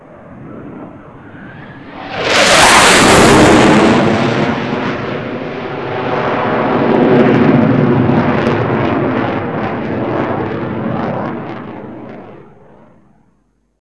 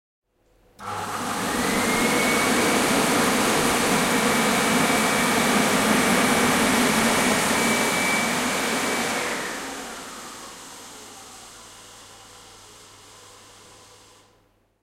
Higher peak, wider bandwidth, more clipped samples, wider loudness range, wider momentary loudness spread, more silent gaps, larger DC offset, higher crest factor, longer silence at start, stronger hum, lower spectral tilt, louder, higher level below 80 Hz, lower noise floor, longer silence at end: first, 0 dBFS vs -8 dBFS; second, 11 kHz vs 16 kHz; first, 0.5% vs under 0.1%; second, 12 LU vs 16 LU; first, 24 LU vs 20 LU; neither; first, 0.6% vs under 0.1%; about the same, 12 dB vs 16 dB; second, 0.1 s vs 0.8 s; neither; first, -4.5 dB/octave vs -2.5 dB/octave; first, -11 LUFS vs -21 LUFS; first, -38 dBFS vs -52 dBFS; second, -58 dBFS vs -62 dBFS; second, 1.45 s vs 2.15 s